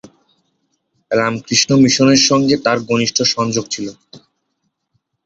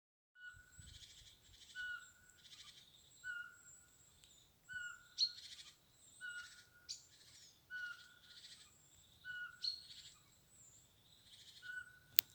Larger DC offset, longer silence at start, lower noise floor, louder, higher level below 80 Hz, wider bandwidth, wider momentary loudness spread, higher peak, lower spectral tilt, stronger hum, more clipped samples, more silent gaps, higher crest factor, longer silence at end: neither; first, 1.1 s vs 0.35 s; about the same, -70 dBFS vs -69 dBFS; first, -14 LUFS vs -46 LUFS; first, -54 dBFS vs -78 dBFS; second, 8 kHz vs over 20 kHz; second, 10 LU vs 22 LU; about the same, 0 dBFS vs -2 dBFS; first, -3.5 dB/octave vs 1.5 dB/octave; neither; neither; neither; second, 16 dB vs 48 dB; first, 1.05 s vs 0 s